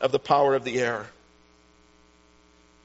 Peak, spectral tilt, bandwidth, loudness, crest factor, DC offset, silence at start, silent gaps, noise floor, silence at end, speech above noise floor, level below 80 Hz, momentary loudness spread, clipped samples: -8 dBFS; -3 dB/octave; 8 kHz; -24 LUFS; 20 dB; under 0.1%; 0 s; none; -58 dBFS; 1.75 s; 35 dB; -64 dBFS; 13 LU; under 0.1%